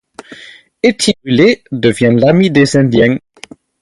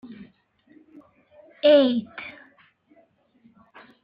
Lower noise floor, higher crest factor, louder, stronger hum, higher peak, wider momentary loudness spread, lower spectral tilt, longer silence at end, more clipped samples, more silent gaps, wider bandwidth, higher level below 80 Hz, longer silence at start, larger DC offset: second, -37 dBFS vs -61 dBFS; second, 12 dB vs 20 dB; first, -11 LUFS vs -20 LUFS; neither; first, 0 dBFS vs -8 dBFS; second, 5 LU vs 27 LU; second, -5.5 dB/octave vs -7.5 dB/octave; second, 0.65 s vs 1.75 s; neither; neither; first, 11.5 kHz vs 5.4 kHz; first, -46 dBFS vs -74 dBFS; about the same, 0.3 s vs 0.2 s; neither